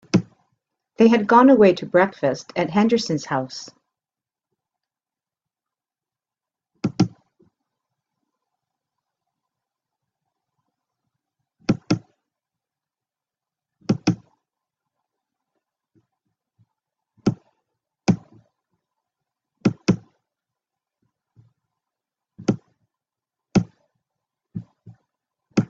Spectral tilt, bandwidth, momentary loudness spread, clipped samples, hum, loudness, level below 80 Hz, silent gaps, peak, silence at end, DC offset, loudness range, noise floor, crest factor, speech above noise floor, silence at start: -6.5 dB/octave; 7.8 kHz; 21 LU; under 0.1%; none; -21 LUFS; -60 dBFS; none; -2 dBFS; 0.05 s; under 0.1%; 16 LU; under -90 dBFS; 22 dB; over 73 dB; 0.15 s